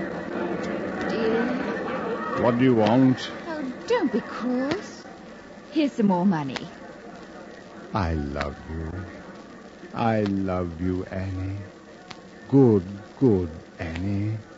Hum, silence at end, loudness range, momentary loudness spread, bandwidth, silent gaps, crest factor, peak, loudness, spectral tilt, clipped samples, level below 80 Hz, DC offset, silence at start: none; 0 s; 6 LU; 22 LU; 8 kHz; none; 18 dB; -6 dBFS; -25 LUFS; -7.5 dB/octave; under 0.1%; -48 dBFS; under 0.1%; 0 s